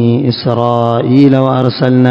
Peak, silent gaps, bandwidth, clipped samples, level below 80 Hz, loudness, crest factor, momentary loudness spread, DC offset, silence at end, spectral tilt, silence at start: 0 dBFS; none; 5.8 kHz; 1%; -48 dBFS; -10 LUFS; 10 dB; 5 LU; under 0.1%; 0 s; -9.5 dB/octave; 0 s